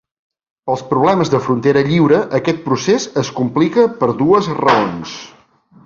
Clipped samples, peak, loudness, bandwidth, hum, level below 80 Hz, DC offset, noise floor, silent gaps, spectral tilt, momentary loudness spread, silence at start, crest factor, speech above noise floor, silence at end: under 0.1%; 0 dBFS; -15 LUFS; 7.6 kHz; none; -52 dBFS; under 0.1%; -48 dBFS; none; -6 dB/octave; 9 LU; 0.65 s; 14 dB; 34 dB; 0.6 s